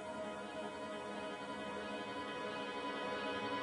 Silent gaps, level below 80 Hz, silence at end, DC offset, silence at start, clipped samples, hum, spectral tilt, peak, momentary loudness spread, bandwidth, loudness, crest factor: none; -78 dBFS; 0 s; under 0.1%; 0 s; under 0.1%; none; -4 dB/octave; -28 dBFS; 5 LU; 11.5 kHz; -43 LUFS; 14 dB